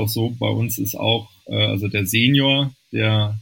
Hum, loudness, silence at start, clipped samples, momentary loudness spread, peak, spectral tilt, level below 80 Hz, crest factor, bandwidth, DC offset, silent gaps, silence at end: none; -19 LUFS; 0 s; under 0.1%; 7 LU; -2 dBFS; -5 dB/octave; -54 dBFS; 18 dB; 17 kHz; under 0.1%; none; 0 s